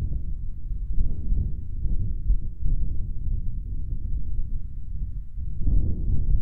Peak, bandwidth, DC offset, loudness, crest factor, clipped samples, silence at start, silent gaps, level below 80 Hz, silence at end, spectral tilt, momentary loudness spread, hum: -8 dBFS; 0.7 kHz; under 0.1%; -32 LUFS; 14 dB; under 0.1%; 0 s; none; -26 dBFS; 0 s; -13 dB/octave; 9 LU; none